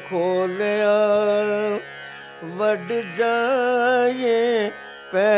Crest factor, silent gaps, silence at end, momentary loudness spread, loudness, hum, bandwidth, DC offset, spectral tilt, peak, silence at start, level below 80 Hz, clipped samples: 12 dB; none; 0 s; 16 LU; -21 LUFS; none; 4 kHz; under 0.1%; -9 dB/octave; -8 dBFS; 0 s; -72 dBFS; under 0.1%